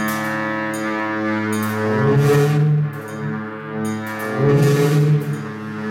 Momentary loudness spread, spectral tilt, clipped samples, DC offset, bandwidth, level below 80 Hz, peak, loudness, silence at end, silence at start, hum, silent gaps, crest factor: 12 LU; -7 dB/octave; under 0.1%; under 0.1%; 16.5 kHz; -56 dBFS; -4 dBFS; -19 LUFS; 0 s; 0 s; none; none; 14 dB